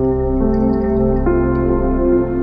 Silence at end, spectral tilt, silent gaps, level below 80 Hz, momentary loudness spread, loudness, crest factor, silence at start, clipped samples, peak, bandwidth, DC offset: 0 s; -12.5 dB/octave; none; -22 dBFS; 1 LU; -16 LUFS; 12 dB; 0 s; under 0.1%; -4 dBFS; 5.2 kHz; under 0.1%